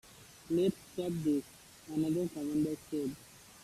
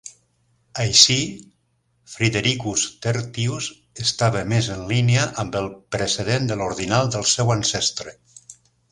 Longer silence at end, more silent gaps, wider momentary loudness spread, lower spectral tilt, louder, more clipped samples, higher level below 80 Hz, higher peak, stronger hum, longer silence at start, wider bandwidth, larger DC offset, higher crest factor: second, 0 s vs 0.4 s; neither; first, 21 LU vs 12 LU; first, -6.5 dB/octave vs -3.5 dB/octave; second, -35 LUFS vs -20 LUFS; neither; second, -66 dBFS vs -50 dBFS; second, -20 dBFS vs 0 dBFS; neither; about the same, 0.1 s vs 0.05 s; about the same, 15 kHz vs 16 kHz; neither; second, 16 dB vs 22 dB